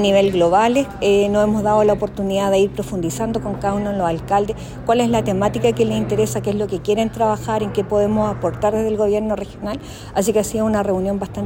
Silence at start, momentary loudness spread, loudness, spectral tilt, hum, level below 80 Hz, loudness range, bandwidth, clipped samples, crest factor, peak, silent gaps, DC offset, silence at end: 0 s; 7 LU; -19 LUFS; -6 dB/octave; none; -40 dBFS; 3 LU; 16.5 kHz; under 0.1%; 14 dB; -4 dBFS; none; under 0.1%; 0 s